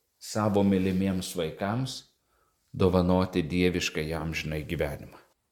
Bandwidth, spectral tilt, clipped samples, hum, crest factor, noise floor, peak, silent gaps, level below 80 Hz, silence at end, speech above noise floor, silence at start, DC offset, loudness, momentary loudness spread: 18 kHz; -6 dB/octave; under 0.1%; none; 20 dB; -71 dBFS; -8 dBFS; none; -48 dBFS; 0.35 s; 43 dB; 0.2 s; under 0.1%; -28 LUFS; 10 LU